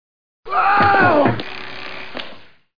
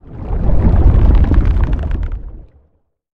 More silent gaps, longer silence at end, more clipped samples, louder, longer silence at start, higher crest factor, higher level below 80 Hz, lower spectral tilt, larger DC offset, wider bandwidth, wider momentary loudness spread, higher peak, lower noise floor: neither; second, 0.05 s vs 0.7 s; neither; about the same, -15 LUFS vs -15 LUFS; first, 0.4 s vs 0.1 s; about the same, 16 dB vs 12 dB; second, -50 dBFS vs -14 dBFS; second, -7.5 dB/octave vs -10.5 dB/octave; first, 3% vs under 0.1%; first, 5.2 kHz vs 4.1 kHz; first, 18 LU vs 14 LU; second, -4 dBFS vs 0 dBFS; second, -39 dBFS vs -58 dBFS